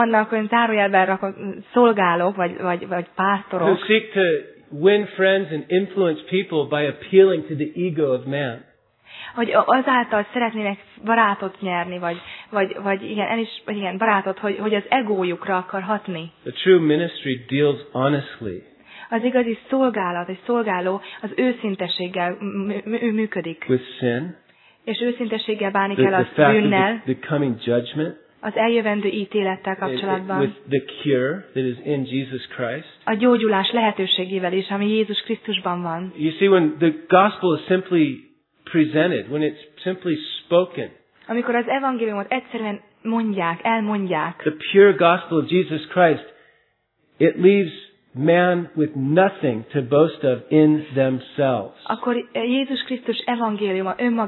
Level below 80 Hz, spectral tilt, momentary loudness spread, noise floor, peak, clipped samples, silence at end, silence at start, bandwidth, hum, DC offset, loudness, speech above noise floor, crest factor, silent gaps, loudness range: -70 dBFS; -9.5 dB/octave; 11 LU; -66 dBFS; 0 dBFS; under 0.1%; 0 s; 0 s; 4.3 kHz; none; under 0.1%; -21 LUFS; 46 dB; 20 dB; none; 4 LU